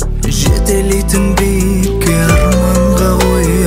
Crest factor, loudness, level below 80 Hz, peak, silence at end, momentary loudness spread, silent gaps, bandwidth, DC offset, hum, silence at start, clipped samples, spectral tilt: 10 dB; -12 LUFS; -16 dBFS; 0 dBFS; 0 s; 3 LU; none; 16.5 kHz; under 0.1%; none; 0 s; under 0.1%; -5.5 dB/octave